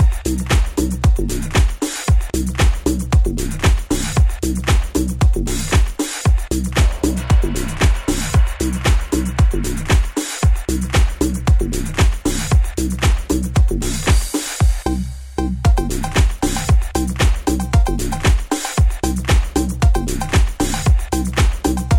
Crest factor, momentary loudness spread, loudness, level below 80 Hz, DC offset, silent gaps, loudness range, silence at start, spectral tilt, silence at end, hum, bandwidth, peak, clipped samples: 12 dB; 4 LU; -18 LUFS; -18 dBFS; under 0.1%; none; 1 LU; 0 s; -5 dB/octave; 0 s; none; 17 kHz; -2 dBFS; under 0.1%